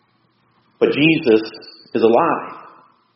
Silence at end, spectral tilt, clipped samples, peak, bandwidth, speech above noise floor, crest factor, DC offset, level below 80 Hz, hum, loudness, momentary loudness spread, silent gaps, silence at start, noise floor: 0.55 s; -4 dB/octave; under 0.1%; 0 dBFS; 5.8 kHz; 45 dB; 18 dB; under 0.1%; -62 dBFS; none; -16 LUFS; 18 LU; none; 0.8 s; -61 dBFS